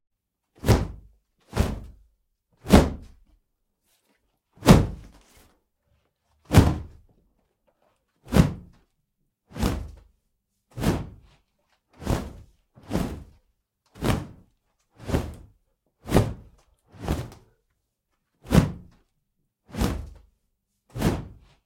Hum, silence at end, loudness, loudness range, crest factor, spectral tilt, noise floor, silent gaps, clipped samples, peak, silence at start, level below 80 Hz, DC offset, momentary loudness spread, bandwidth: none; 0.3 s; -25 LUFS; 9 LU; 26 dB; -6.5 dB/octave; -77 dBFS; none; under 0.1%; -2 dBFS; 0.65 s; -36 dBFS; under 0.1%; 25 LU; 16.5 kHz